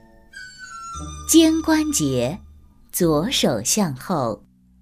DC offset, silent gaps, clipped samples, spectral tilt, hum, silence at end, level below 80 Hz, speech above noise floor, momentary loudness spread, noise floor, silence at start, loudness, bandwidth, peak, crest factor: under 0.1%; none; under 0.1%; -4 dB/octave; none; 0.45 s; -44 dBFS; 28 dB; 21 LU; -47 dBFS; 0.35 s; -20 LUFS; 16 kHz; -2 dBFS; 20 dB